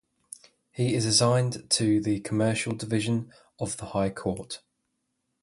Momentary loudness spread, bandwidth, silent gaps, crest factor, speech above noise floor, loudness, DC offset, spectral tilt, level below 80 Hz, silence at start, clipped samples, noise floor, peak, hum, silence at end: 23 LU; 11.5 kHz; none; 20 dB; 52 dB; -26 LUFS; under 0.1%; -4.5 dB/octave; -56 dBFS; 0.75 s; under 0.1%; -78 dBFS; -8 dBFS; none; 0.85 s